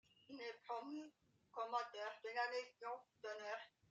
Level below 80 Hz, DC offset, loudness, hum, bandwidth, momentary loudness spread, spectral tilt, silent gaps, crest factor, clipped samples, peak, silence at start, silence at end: under -90 dBFS; under 0.1%; -49 LUFS; none; 9 kHz; 10 LU; -2.5 dB/octave; none; 20 dB; under 0.1%; -30 dBFS; 0.3 s; 0.2 s